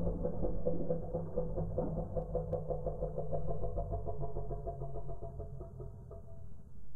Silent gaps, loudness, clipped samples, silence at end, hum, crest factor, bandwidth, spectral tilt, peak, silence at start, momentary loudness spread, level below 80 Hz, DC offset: none; -40 LUFS; under 0.1%; 0 s; none; 16 dB; 1.7 kHz; -12.5 dB/octave; -20 dBFS; 0 s; 12 LU; -44 dBFS; under 0.1%